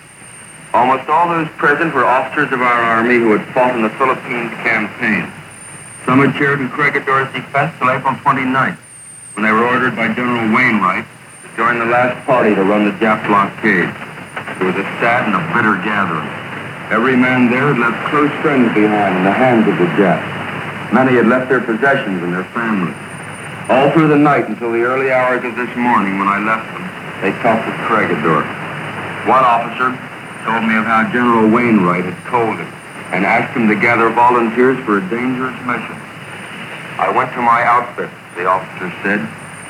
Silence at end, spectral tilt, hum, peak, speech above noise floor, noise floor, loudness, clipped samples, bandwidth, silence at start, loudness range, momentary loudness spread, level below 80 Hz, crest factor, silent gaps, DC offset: 0 s; -6.5 dB/octave; none; 0 dBFS; 23 dB; -36 dBFS; -14 LUFS; under 0.1%; 14 kHz; 0.05 s; 3 LU; 14 LU; -58 dBFS; 14 dB; none; under 0.1%